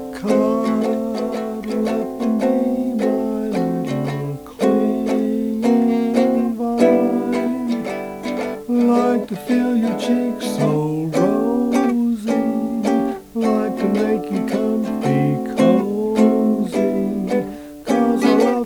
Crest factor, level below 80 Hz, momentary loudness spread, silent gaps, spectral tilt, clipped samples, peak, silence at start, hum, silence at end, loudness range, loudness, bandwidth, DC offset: 16 dB; -52 dBFS; 7 LU; none; -7 dB/octave; under 0.1%; -2 dBFS; 0 s; none; 0 s; 2 LU; -19 LUFS; 19 kHz; under 0.1%